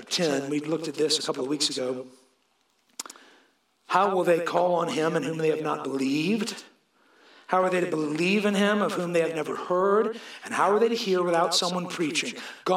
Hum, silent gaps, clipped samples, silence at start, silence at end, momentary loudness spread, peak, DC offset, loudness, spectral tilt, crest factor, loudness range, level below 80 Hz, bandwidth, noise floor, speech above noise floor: none; none; under 0.1%; 0 s; 0 s; 11 LU; -6 dBFS; under 0.1%; -25 LUFS; -4 dB/octave; 20 dB; 4 LU; -82 dBFS; 16 kHz; -69 dBFS; 44 dB